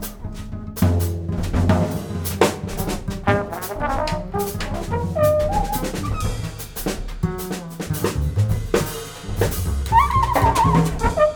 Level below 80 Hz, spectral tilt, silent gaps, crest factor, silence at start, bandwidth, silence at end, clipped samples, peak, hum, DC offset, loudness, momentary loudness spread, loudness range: -30 dBFS; -6 dB/octave; none; 20 dB; 0 s; over 20 kHz; 0 s; under 0.1%; 0 dBFS; none; under 0.1%; -22 LUFS; 11 LU; 5 LU